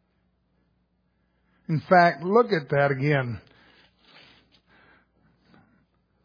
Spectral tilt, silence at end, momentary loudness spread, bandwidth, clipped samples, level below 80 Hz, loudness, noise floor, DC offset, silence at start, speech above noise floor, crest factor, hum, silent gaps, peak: -8.5 dB/octave; 2.85 s; 15 LU; 5.2 kHz; under 0.1%; -66 dBFS; -22 LUFS; -70 dBFS; under 0.1%; 1.7 s; 49 dB; 22 dB; none; none; -4 dBFS